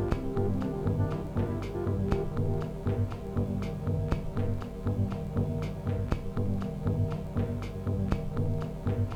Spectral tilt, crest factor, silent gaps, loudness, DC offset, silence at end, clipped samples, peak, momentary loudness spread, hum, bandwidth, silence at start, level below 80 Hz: -9 dB/octave; 20 dB; none; -32 LUFS; under 0.1%; 0 s; under 0.1%; -10 dBFS; 3 LU; none; 9.2 kHz; 0 s; -40 dBFS